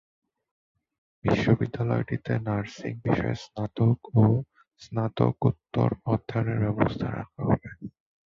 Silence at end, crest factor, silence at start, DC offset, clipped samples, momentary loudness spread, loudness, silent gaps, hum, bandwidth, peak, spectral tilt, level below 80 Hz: 0.4 s; 20 dB; 1.25 s; under 0.1%; under 0.1%; 10 LU; -27 LUFS; none; none; 7.2 kHz; -6 dBFS; -8.5 dB/octave; -50 dBFS